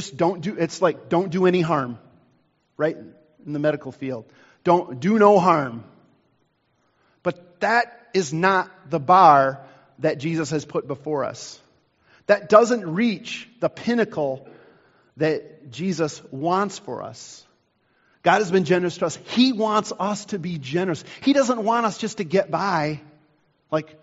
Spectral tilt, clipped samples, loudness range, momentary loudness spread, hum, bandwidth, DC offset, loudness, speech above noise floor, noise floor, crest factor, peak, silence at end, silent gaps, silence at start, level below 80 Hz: -4.5 dB/octave; under 0.1%; 7 LU; 16 LU; none; 8 kHz; under 0.1%; -22 LUFS; 46 dB; -67 dBFS; 22 dB; 0 dBFS; 0.2 s; none; 0 s; -66 dBFS